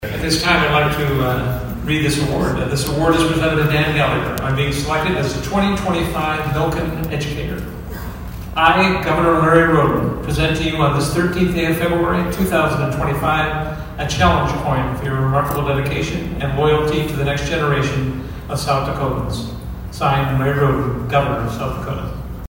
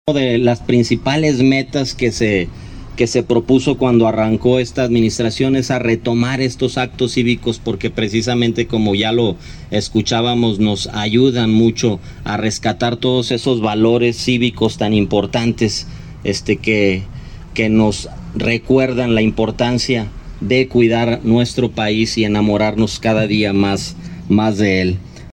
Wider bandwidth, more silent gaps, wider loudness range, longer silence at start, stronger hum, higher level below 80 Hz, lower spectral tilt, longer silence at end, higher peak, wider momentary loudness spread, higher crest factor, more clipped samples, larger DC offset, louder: first, 16.5 kHz vs 11.5 kHz; neither; about the same, 4 LU vs 2 LU; about the same, 0 s vs 0.05 s; neither; first, -30 dBFS vs -36 dBFS; about the same, -5.5 dB/octave vs -5.5 dB/octave; about the same, 0 s vs 0.05 s; about the same, 0 dBFS vs 0 dBFS; first, 10 LU vs 7 LU; about the same, 18 dB vs 14 dB; neither; neither; about the same, -18 LUFS vs -16 LUFS